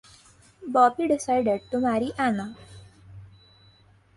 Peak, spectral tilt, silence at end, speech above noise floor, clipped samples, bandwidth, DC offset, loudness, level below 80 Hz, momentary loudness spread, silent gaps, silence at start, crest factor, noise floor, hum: -8 dBFS; -5.5 dB/octave; 0.9 s; 34 dB; under 0.1%; 11.5 kHz; under 0.1%; -24 LUFS; -58 dBFS; 17 LU; none; 0.6 s; 20 dB; -57 dBFS; none